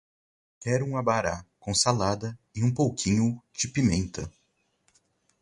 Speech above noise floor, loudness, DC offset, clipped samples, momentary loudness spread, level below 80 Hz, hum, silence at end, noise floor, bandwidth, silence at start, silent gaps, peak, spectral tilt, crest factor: 44 dB; -27 LUFS; under 0.1%; under 0.1%; 12 LU; -48 dBFS; none; 1.1 s; -70 dBFS; 11.5 kHz; 0.6 s; none; -8 dBFS; -4.5 dB/octave; 20 dB